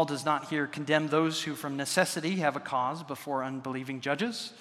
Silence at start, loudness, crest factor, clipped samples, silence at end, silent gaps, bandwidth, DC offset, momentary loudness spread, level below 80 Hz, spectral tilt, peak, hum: 0 s; -30 LUFS; 22 dB; under 0.1%; 0 s; none; 16 kHz; under 0.1%; 7 LU; -80 dBFS; -4 dB/octave; -8 dBFS; none